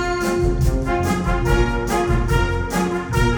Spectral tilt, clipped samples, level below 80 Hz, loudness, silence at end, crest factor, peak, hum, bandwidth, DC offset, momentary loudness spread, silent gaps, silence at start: -6 dB/octave; under 0.1%; -24 dBFS; -20 LUFS; 0 s; 16 dB; -4 dBFS; none; over 20 kHz; under 0.1%; 2 LU; none; 0 s